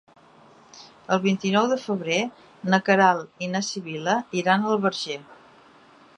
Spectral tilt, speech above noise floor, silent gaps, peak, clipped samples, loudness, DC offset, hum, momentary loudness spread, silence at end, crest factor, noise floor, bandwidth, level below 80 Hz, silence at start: -5 dB/octave; 30 dB; none; -2 dBFS; under 0.1%; -23 LUFS; under 0.1%; none; 12 LU; 0.85 s; 22 dB; -53 dBFS; 9.6 kHz; -74 dBFS; 0.75 s